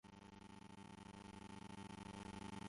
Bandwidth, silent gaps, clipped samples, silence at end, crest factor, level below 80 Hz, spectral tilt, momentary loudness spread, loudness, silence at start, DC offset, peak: 11.5 kHz; none; under 0.1%; 0 s; 16 dB; -70 dBFS; -5 dB/octave; 7 LU; -56 LUFS; 0.05 s; under 0.1%; -40 dBFS